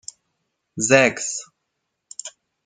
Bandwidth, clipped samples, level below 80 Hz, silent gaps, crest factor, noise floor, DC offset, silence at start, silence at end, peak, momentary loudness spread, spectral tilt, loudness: 9.6 kHz; under 0.1%; -66 dBFS; none; 22 dB; -77 dBFS; under 0.1%; 0.75 s; 0.35 s; -2 dBFS; 24 LU; -3 dB/octave; -19 LUFS